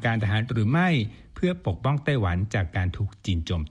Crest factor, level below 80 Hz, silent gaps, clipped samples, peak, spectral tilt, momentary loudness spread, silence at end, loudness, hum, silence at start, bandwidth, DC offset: 14 dB; -42 dBFS; none; under 0.1%; -10 dBFS; -7 dB/octave; 7 LU; 0 s; -26 LUFS; none; 0 s; 9.6 kHz; under 0.1%